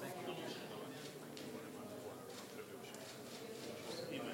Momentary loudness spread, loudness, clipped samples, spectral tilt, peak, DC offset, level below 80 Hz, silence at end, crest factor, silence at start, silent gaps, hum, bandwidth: 5 LU; -49 LUFS; under 0.1%; -4 dB/octave; -32 dBFS; under 0.1%; -86 dBFS; 0 s; 18 dB; 0 s; none; none; 16 kHz